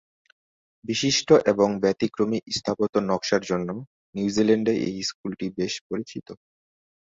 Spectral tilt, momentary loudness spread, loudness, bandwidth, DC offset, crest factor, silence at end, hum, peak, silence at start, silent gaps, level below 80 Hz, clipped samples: -4.5 dB/octave; 14 LU; -24 LUFS; 8 kHz; under 0.1%; 22 dB; 0.65 s; none; -4 dBFS; 0.85 s; 2.89-2.93 s, 3.87-4.13 s, 5.14-5.24 s, 5.81-5.90 s; -60 dBFS; under 0.1%